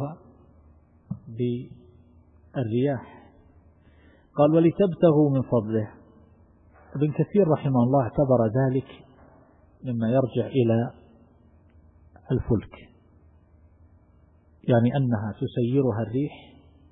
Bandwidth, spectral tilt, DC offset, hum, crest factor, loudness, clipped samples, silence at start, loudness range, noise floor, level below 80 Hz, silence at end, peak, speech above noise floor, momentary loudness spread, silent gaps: 3.9 kHz; -13 dB/octave; under 0.1%; none; 20 dB; -24 LUFS; under 0.1%; 0 s; 8 LU; -57 dBFS; -52 dBFS; 0.55 s; -6 dBFS; 35 dB; 16 LU; none